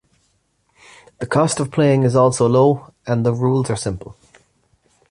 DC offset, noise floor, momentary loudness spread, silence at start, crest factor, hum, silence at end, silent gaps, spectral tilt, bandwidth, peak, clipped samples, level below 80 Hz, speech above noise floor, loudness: under 0.1%; -64 dBFS; 11 LU; 1.2 s; 16 dB; none; 1 s; none; -6.5 dB/octave; 11 kHz; -2 dBFS; under 0.1%; -48 dBFS; 48 dB; -17 LUFS